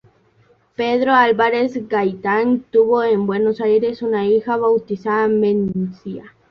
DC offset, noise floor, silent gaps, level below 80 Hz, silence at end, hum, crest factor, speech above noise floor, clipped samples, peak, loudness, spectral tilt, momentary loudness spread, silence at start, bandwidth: under 0.1%; -56 dBFS; none; -58 dBFS; 0.2 s; none; 16 dB; 39 dB; under 0.1%; -2 dBFS; -17 LUFS; -8 dB/octave; 10 LU; 0.8 s; 6 kHz